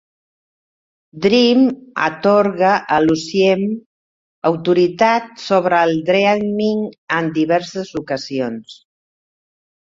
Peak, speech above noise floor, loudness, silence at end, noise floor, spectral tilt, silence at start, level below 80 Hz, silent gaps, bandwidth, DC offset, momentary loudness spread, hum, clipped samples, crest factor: -2 dBFS; over 74 dB; -16 LUFS; 1.15 s; under -90 dBFS; -5.5 dB/octave; 1.15 s; -58 dBFS; 3.86-4.42 s, 6.98-7.07 s; 7.8 kHz; under 0.1%; 10 LU; none; under 0.1%; 16 dB